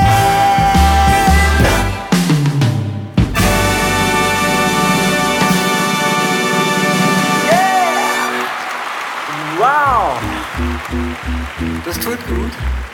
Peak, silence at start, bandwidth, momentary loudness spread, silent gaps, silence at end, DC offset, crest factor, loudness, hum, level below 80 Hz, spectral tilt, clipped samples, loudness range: 0 dBFS; 0 s; 18 kHz; 10 LU; none; 0 s; under 0.1%; 14 dB; -14 LUFS; none; -24 dBFS; -4.5 dB/octave; under 0.1%; 4 LU